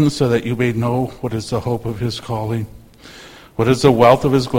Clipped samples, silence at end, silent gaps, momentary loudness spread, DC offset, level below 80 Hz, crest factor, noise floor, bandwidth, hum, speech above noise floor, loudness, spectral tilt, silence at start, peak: under 0.1%; 0 s; none; 13 LU; under 0.1%; -42 dBFS; 18 dB; -40 dBFS; 16.5 kHz; none; 24 dB; -17 LUFS; -6.5 dB/octave; 0 s; 0 dBFS